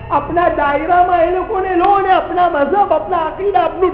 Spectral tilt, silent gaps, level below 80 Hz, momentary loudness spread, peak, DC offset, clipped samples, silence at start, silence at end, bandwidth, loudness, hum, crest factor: -9.5 dB/octave; none; -36 dBFS; 5 LU; 0 dBFS; under 0.1%; under 0.1%; 0 s; 0 s; 5 kHz; -14 LUFS; none; 14 dB